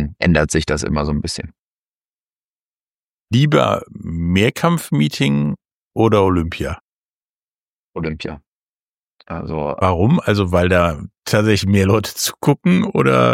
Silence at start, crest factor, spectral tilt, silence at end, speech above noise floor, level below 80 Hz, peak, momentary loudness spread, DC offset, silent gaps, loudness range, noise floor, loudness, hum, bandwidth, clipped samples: 0 s; 16 dB; -6 dB/octave; 0 s; over 74 dB; -36 dBFS; -2 dBFS; 14 LU; under 0.1%; 1.59-3.26 s, 5.74-5.91 s, 6.81-7.92 s, 8.47-9.17 s; 7 LU; under -90 dBFS; -17 LUFS; none; 16.5 kHz; under 0.1%